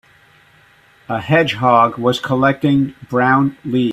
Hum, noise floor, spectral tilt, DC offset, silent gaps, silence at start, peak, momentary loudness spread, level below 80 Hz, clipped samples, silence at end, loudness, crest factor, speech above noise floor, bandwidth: none; -50 dBFS; -7 dB/octave; under 0.1%; none; 1.1 s; 0 dBFS; 6 LU; -52 dBFS; under 0.1%; 0 s; -15 LUFS; 16 dB; 35 dB; 13.5 kHz